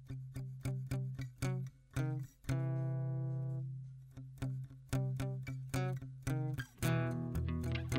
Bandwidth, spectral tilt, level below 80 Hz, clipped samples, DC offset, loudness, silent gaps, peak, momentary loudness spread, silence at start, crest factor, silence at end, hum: 16 kHz; -6.5 dB/octave; -54 dBFS; under 0.1%; under 0.1%; -40 LUFS; none; -18 dBFS; 9 LU; 0 s; 20 dB; 0 s; none